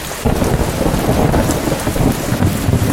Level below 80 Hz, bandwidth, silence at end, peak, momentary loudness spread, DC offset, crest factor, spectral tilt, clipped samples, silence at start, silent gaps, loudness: -24 dBFS; 17 kHz; 0 s; 0 dBFS; 3 LU; under 0.1%; 14 dB; -5.5 dB/octave; under 0.1%; 0 s; none; -16 LUFS